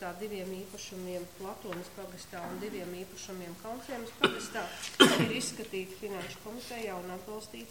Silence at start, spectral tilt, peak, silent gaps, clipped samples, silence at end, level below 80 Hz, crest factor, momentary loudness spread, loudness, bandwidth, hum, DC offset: 0 s; -3.5 dB/octave; -6 dBFS; none; under 0.1%; 0 s; -66 dBFS; 30 dB; 15 LU; -34 LUFS; 16.5 kHz; none; 0.1%